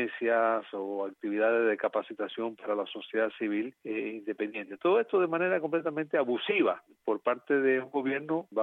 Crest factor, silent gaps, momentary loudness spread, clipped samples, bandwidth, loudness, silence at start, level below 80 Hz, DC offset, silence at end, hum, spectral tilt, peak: 16 dB; none; 9 LU; under 0.1%; 4.1 kHz; -30 LUFS; 0 s; -88 dBFS; under 0.1%; 0 s; none; -7.5 dB/octave; -14 dBFS